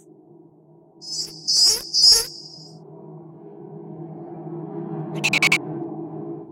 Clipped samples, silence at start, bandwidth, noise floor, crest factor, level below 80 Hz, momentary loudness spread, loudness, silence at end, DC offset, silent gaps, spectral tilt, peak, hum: under 0.1%; 1 s; 16.5 kHz; -52 dBFS; 22 dB; -58 dBFS; 26 LU; -17 LUFS; 0 s; under 0.1%; none; -1 dB/octave; -2 dBFS; none